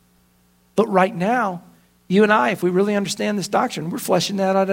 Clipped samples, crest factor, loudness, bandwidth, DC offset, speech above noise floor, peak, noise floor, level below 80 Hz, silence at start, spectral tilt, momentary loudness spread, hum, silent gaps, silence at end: under 0.1%; 20 dB; -19 LUFS; 16.5 kHz; under 0.1%; 40 dB; 0 dBFS; -58 dBFS; -64 dBFS; 0.75 s; -5 dB/octave; 9 LU; 60 Hz at -40 dBFS; none; 0 s